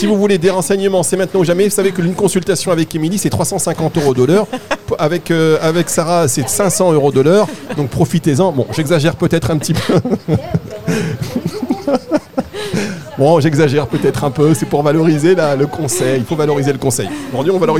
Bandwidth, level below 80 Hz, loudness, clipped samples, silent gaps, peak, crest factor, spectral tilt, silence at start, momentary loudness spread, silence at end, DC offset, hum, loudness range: 17.5 kHz; -44 dBFS; -14 LUFS; under 0.1%; none; 0 dBFS; 14 dB; -5.5 dB/octave; 0 s; 8 LU; 0 s; 1%; none; 3 LU